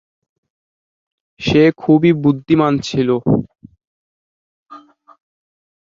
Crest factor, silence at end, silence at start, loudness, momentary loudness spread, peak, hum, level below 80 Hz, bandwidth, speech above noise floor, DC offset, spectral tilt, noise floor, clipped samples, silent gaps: 16 dB; 1.05 s; 1.4 s; -15 LUFS; 6 LU; -2 dBFS; none; -48 dBFS; 7.6 kHz; 28 dB; under 0.1%; -7 dB/octave; -42 dBFS; under 0.1%; 3.87-4.66 s